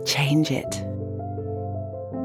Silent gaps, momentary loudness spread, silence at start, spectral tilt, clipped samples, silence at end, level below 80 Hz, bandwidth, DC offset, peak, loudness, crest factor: none; 11 LU; 0 s; -5 dB/octave; under 0.1%; 0 s; -56 dBFS; 16.5 kHz; under 0.1%; -10 dBFS; -26 LUFS; 16 dB